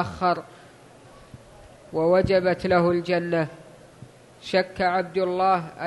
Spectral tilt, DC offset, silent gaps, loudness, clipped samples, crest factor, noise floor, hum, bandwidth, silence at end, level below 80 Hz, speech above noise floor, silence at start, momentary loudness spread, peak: -7 dB/octave; under 0.1%; none; -23 LUFS; under 0.1%; 18 dB; -49 dBFS; none; 11.5 kHz; 0 s; -52 dBFS; 26 dB; 0 s; 8 LU; -8 dBFS